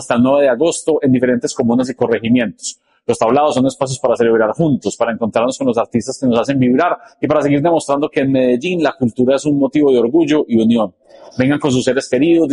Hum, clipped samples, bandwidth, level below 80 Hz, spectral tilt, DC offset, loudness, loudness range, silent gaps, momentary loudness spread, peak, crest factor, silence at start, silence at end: none; under 0.1%; 11.5 kHz; -52 dBFS; -6 dB/octave; under 0.1%; -15 LUFS; 1 LU; none; 6 LU; -2 dBFS; 12 dB; 0 s; 0 s